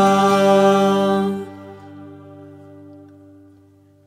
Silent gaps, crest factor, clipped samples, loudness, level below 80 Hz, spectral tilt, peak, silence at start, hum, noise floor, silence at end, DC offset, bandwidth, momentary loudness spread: none; 16 dB; under 0.1%; -16 LUFS; -68 dBFS; -6 dB/octave; -4 dBFS; 0 s; none; -51 dBFS; 1.6 s; under 0.1%; 15 kHz; 26 LU